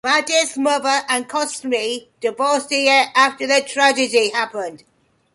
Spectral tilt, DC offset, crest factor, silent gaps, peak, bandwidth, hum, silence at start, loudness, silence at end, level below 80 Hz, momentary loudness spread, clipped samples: -0.5 dB/octave; under 0.1%; 16 dB; none; -2 dBFS; 11.5 kHz; none; 0.05 s; -17 LUFS; 0.6 s; -70 dBFS; 10 LU; under 0.1%